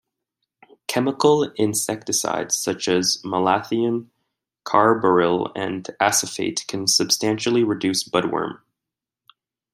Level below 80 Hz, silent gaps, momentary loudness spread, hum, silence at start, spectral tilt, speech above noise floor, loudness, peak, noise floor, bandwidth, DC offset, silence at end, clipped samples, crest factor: -66 dBFS; none; 9 LU; none; 0.9 s; -3 dB/octave; 66 dB; -21 LUFS; -2 dBFS; -86 dBFS; 15.5 kHz; under 0.1%; 1.2 s; under 0.1%; 20 dB